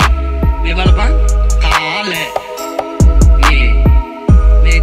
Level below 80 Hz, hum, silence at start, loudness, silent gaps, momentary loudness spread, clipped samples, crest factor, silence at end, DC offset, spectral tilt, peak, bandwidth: -10 dBFS; none; 0 s; -12 LUFS; none; 9 LU; under 0.1%; 10 dB; 0 s; under 0.1%; -5.5 dB/octave; 0 dBFS; 14 kHz